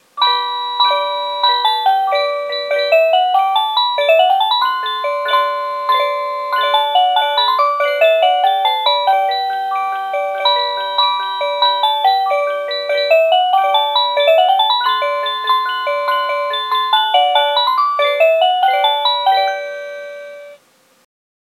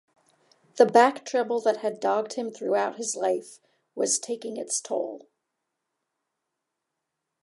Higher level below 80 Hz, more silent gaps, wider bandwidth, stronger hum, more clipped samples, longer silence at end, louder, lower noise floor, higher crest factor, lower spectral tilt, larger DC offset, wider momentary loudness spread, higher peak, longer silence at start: about the same, -88 dBFS vs -86 dBFS; neither; first, 13.5 kHz vs 11.5 kHz; neither; neither; second, 1 s vs 2.25 s; first, -14 LUFS vs -25 LUFS; second, -52 dBFS vs -83 dBFS; second, 14 dB vs 24 dB; second, 1 dB/octave vs -2.5 dB/octave; neither; second, 7 LU vs 13 LU; first, 0 dBFS vs -4 dBFS; second, 0.15 s vs 0.75 s